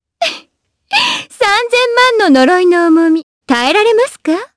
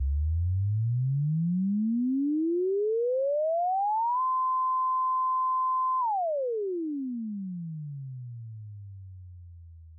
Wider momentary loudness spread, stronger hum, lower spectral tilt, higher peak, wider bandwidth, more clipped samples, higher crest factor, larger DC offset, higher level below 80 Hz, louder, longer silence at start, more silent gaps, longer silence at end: second, 9 LU vs 16 LU; neither; second, -2 dB/octave vs -17.5 dB/octave; first, 0 dBFS vs -24 dBFS; first, 11 kHz vs 1.1 kHz; neither; first, 12 dB vs 4 dB; neither; second, -56 dBFS vs -44 dBFS; first, -11 LUFS vs -28 LUFS; first, 0.2 s vs 0 s; first, 3.23-3.41 s vs none; about the same, 0.1 s vs 0 s